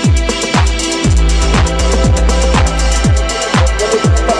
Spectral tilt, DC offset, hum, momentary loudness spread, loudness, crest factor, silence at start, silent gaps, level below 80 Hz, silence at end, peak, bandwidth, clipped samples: -4.5 dB/octave; under 0.1%; none; 2 LU; -12 LUFS; 10 dB; 0 s; none; -14 dBFS; 0 s; 0 dBFS; 11 kHz; under 0.1%